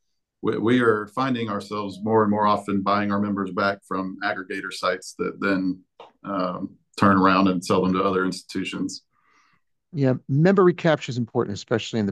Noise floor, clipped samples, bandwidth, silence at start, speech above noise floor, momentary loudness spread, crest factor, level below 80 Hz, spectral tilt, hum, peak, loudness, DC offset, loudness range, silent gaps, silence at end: -67 dBFS; under 0.1%; 12.5 kHz; 0.45 s; 45 dB; 12 LU; 18 dB; -66 dBFS; -6.5 dB/octave; none; -6 dBFS; -23 LUFS; under 0.1%; 4 LU; none; 0 s